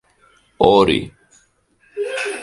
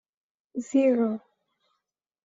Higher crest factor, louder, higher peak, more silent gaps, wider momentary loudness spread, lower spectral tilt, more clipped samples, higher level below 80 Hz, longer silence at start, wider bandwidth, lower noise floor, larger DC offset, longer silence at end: about the same, 20 dB vs 16 dB; first, -17 LUFS vs -25 LUFS; first, 0 dBFS vs -12 dBFS; neither; first, 21 LU vs 15 LU; second, -5 dB/octave vs -6.5 dB/octave; neither; first, -44 dBFS vs -76 dBFS; about the same, 0.6 s vs 0.55 s; first, 11.5 kHz vs 7.8 kHz; second, -58 dBFS vs -83 dBFS; neither; second, 0 s vs 1.05 s